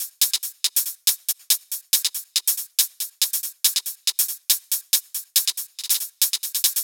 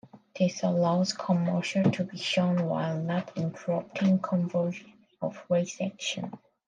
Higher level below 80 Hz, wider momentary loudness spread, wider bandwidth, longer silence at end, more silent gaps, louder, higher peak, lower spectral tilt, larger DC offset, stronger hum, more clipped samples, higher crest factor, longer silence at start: second, -88 dBFS vs -74 dBFS; second, 3 LU vs 10 LU; first, over 20 kHz vs 9.2 kHz; second, 0 s vs 0.3 s; neither; first, -21 LUFS vs -29 LUFS; first, -2 dBFS vs -10 dBFS; second, 6.5 dB/octave vs -6 dB/octave; neither; neither; neither; about the same, 22 dB vs 20 dB; second, 0 s vs 0.15 s